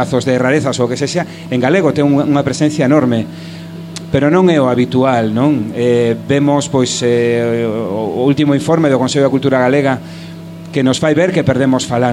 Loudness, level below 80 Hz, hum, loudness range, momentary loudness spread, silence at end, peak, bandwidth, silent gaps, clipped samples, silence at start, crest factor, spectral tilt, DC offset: -13 LUFS; -48 dBFS; none; 1 LU; 9 LU; 0 s; 0 dBFS; 12.5 kHz; none; under 0.1%; 0 s; 12 dB; -6 dB/octave; under 0.1%